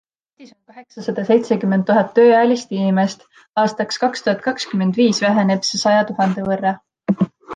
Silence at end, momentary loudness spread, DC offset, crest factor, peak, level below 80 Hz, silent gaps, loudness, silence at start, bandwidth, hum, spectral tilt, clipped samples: 0 s; 10 LU; under 0.1%; 14 dB; -2 dBFS; -62 dBFS; 3.49-3.53 s; -17 LUFS; 0.4 s; 9.4 kHz; none; -5.5 dB/octave; under 0.1%